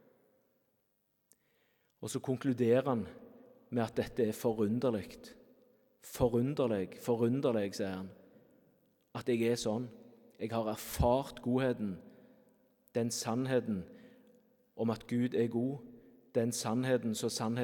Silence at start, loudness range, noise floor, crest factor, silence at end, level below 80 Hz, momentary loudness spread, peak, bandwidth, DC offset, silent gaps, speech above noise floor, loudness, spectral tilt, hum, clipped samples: 2 s; 3 LU; -79 dBFS; 20 dB; 0 s; -58 dBFS; 16 LU; -16 dBFS; 18 kHz; under 0.1%; none; 45 dB; -34 LUFS; -6 dB/octave; none; under 0.1%